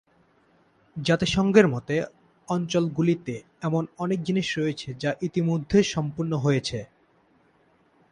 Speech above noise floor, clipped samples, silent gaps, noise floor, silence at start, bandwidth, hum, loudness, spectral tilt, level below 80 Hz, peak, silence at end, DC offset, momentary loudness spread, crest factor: 38 dB; under 0.1%; none; -63 dBFS; 0.95 s; 10.5 kHz; none; -25 LUFS; -6 dB/octave; -54 dBFS; -4 dBFS; 1.25 s; under 0.1%; 11 LU; 22 dB